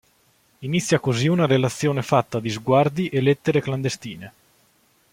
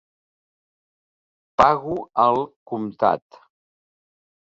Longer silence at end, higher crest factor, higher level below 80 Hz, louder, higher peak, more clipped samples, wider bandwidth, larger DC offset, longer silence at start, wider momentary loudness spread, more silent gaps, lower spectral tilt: second, 0.85 s vs 1.35 s; about the same, 20 dB vs 22 dB; about the same, -60 dBFS vs -56 dBFS; about the same, -21 LUFS vs -21 LUFS; about the same, -2 dBFS vs -2 dBFS; neither; first, 16 kHz vs 7.8 kHz; neither; second, 0.6 s vs 1.6 s; about the same, 10 LU vs 12 LU; second, none vs 2.56-2.66 s; about the same, -6 dB/octave vs -6.5 dB/octave